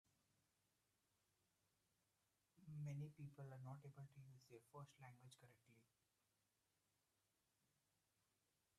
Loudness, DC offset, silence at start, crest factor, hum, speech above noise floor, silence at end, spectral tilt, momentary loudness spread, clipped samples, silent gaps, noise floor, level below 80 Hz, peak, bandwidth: -59 LUFS; under 0.1%; 2.55 s; 18 dB; none; 27 dB; 2.95 s; -7 dB/octave; 13 LU; under 0.1%; none; -89 dBFS; under -90 dBFS; -44 dBFS; 13 kHz